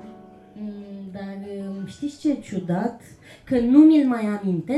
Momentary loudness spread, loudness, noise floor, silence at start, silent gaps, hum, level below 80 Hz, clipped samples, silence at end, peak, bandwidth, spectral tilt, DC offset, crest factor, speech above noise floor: 21 LU; -21 LUFS; -45 dBFS; 0.05 s; none; none; -56 dBFS; under 0.1%; 0 s; -4 dBFS; 10.5 kHz; -8 dB/octave; under 0.1%; 18 dB; 25 dB